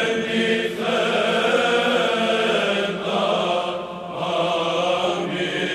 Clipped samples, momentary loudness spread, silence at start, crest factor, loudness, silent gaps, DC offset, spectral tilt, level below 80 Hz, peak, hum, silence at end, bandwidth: under 0.1%; 5 LU; 0 s; 14 dB; -21 LUFS; none; under 0.1%; -4 dB/octave; -60 dBFS; -6 dBFS; none; 0 s; 14 kHz